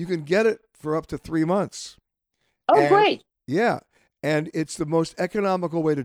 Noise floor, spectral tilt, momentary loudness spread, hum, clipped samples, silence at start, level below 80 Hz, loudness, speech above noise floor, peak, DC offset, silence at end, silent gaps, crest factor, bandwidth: -75 dBFS; -5.5 dB/octave; 13 LU; none; under 0.1%; 0 s; -58 dBFS; -23 LUFS; 53 dB; -6 dBFS; under 0.1%; 0 s; none; 18 dB; 15 kHz